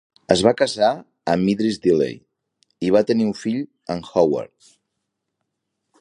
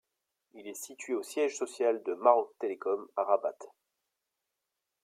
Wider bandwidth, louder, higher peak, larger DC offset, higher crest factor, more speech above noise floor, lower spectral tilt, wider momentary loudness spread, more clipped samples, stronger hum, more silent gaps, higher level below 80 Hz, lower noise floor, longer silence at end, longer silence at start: second, 11 kHz vs 15.5 kHz; first, -20 LUFS vs -31 LUFS; first, 0 dBFS vs -8 dBFS; neither; about the same, 20 dB vs 24 dB; first, 59 dB vs 55 dB; first, -5.5 dB/octave vs -2.5 dB/octave; second, 11 LU vs 17 LU; neither; neither; neither; first, -56 dBFS vs under -90 dBFS; second, -78 dBFS vs -86 dBFS; first, 1.55 s vs 1.35 s; second, 0.3 s vs 0.55 s